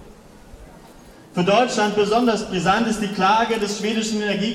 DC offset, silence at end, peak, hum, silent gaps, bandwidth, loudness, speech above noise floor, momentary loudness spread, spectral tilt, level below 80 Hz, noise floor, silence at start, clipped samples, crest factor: under 0.1%; 0 s; -4 dBFS; none; none; 14.5 kHz; -20 LUFS; 25 dB; 5 LU; -4.5 dB/octave; -50 dBFS; -45 dBFS; 0 s; under 0.1%; 16 dB